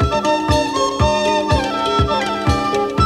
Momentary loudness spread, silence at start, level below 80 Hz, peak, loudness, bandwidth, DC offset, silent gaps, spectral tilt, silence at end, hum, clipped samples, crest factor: 2 LU; 0 s; -28 dBFS; -2 dBFS; -17 LUFS; 14.5 kHz; under 0.1%; none; -5 dB/octave; 0 s; none; under 0.1%; 16 dB